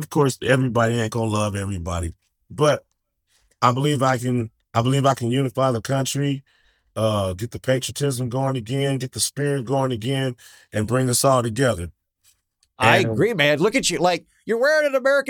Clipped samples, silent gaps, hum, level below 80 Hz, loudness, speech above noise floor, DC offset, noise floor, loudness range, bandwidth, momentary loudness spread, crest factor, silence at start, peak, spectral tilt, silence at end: under 0.1%; none; none; -52 dBFS; -21 LUFS; 47 dB; under 0.1%; -68 dBFS; 4 LU; 19 kHz; 10 LU; 20 dB; 0 s; -2 dBFS; -5 dB/octave; 0 s